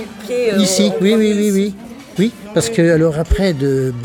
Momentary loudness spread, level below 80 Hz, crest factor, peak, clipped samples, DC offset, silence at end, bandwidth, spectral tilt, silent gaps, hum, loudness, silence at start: 7 LU; -30 dBFS; 14 dB; -2 dBFS; under 0.1%; under 0.1%; 0 s; 18.5 kHz; -5.5 dB/octave; none; none; -15 LUFS; 0 s